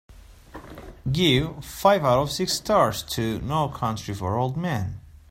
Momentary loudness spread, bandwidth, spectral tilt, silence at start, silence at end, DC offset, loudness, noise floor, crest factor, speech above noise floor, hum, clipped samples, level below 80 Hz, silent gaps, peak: 17 LU; 16 kHz; -5 dB/octave; 0.1 s; 0.2 s; under 0.1%; -24 LUFS; -44 dBFS; 20 dB; 21 dB; none; under 0.1%; -46 dBFS; none; -4 dBFS